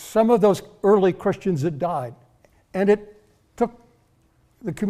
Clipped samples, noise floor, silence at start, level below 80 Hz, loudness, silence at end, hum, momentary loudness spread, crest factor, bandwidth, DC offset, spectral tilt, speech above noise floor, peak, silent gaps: under 0.1%; -61 dBFS; 0 s; -56 dBFS; -21 LUFS; 0 s; none; 14 LU; 16 dB; 14.5 kHz; under 0.1%; -7 dB/octave; 41 dB; -6 dBFS; none